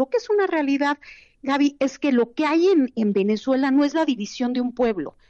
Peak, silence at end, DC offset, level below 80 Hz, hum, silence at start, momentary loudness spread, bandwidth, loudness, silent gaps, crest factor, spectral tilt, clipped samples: -10 dBFS; 0.2 s; under 0.1%; -60 dBFS; none; 0 s; 6 LU; 7.8 kHz; -21 LUFS; none; 12 dB; -5.5 dB/octave; under 0.1%